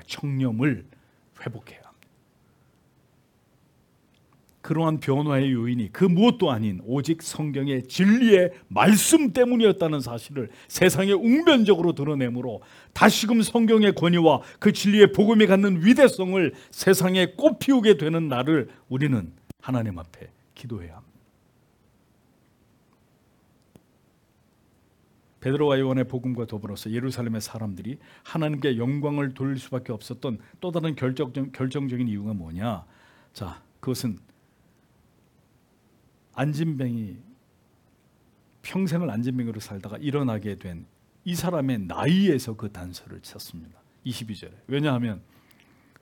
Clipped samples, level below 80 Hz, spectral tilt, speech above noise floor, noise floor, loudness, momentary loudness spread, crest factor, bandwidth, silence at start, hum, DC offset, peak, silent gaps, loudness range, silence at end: under 0.1%; -62 dBFS; -5.5 dB/octave; 40 dB; -63 dBFS; -23 LUFS; 20 LU; 24 dB; 18 kHz; 0.1 s; none; under 0.1%; 0 dBFS; none; 14 LU; 0.8 s